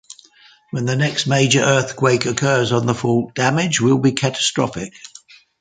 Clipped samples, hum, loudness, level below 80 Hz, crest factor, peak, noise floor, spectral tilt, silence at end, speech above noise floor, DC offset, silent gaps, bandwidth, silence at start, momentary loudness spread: under 0.1%; none; -17 LUFS; -54 dBFS; 18 dB; 0 dBFS; -50 dBFS; -4.5 dB/octave; 0.55 s; 33 dB; under 0.1%; none; 9.6 kHz; 0.75 s; 12 LU